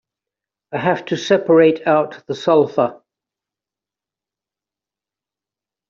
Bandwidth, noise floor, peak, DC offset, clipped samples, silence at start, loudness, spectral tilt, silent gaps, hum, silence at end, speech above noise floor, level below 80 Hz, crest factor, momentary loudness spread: 7.4 kHz; -89 dBFS; -2 dBFS; under 0.1%; under 0.1%; 0.7 s; -17 LUFS; -6 dB/octave; none; none; 2.95 s; 73 dB; -66 dBFS; 18 dB; 10 LU